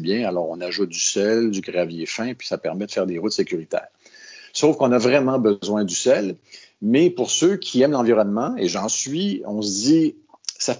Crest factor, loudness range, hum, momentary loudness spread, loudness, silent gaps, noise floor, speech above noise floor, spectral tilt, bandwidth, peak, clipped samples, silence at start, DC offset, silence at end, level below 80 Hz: 16 dB; 5 LU; none; 9 LU; -21 LUFS; none; -44 dBFS; 24 dB; -4 dB/octave; 7.8 kHz; -4 dBFS; under 0.1%; 0 s; under 0.1%; 0 s; -66 dBFS